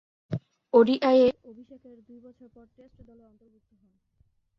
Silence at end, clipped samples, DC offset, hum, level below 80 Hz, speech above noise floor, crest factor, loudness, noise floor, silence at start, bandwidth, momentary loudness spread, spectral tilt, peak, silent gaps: 3.3 s; under 0.1%; under 0.1%; none; -64 dBFS; 42 dB; 22 dB; -23 LUFS; -68 dBFS; 0.3 s; 6 kHz; 17 LU; -8 dB/octave; -6 dBFS; none